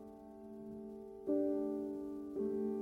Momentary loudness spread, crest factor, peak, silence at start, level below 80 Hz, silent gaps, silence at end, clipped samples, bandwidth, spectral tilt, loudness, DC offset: 16 LU; 16 dB; -24 dBFS; 0 s; -72 dBFS; none; 0 s; under 0.1%; 11.5 kHz; -9.5 dB/octave; -41 LUFS; under 0.1%